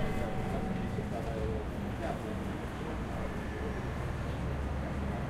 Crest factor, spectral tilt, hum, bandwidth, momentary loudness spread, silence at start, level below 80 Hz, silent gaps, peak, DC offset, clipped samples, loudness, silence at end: 14 dB; -7 dB/octave; none; 15.5 kHz; 3 LU; 0 s; -40 dBFS; none; -20 dBFS; under 0.1%; under 0.1%; -37 LUFS; 0 s